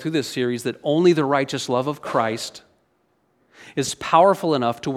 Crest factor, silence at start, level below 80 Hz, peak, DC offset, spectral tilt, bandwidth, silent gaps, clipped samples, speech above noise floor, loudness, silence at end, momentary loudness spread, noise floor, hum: 20 dB; 0 s; -64 dBFS; -2 dBFS; under 0.1%; -5 dB/octave; 15 kHz; none; under 0.1%; 45 dB; -21 LUFS; 0 s; 10 LU; -66 dBFS; none